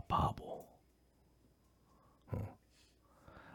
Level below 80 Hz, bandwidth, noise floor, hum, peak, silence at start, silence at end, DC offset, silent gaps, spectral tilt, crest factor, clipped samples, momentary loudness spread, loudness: -60 dBFS; 18 kHz; -71 dBFS; none; -22 dBFS; 0 s; 0 s; under 0.1%; none; -7 dB/octave; 24 dB; under 0.1%; 26 LU; -42 LUFS